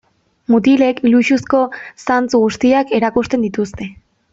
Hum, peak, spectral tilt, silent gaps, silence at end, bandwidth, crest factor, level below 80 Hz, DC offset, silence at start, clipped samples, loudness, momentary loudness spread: none; -2 dBFS; -5.5 dB/octave; none; 0.4 s; 7.8 kHz; 12 dB; -48 dBFS; under 0.1%; 0.5 s; under 0.1%; -15 LUFS; 12 LU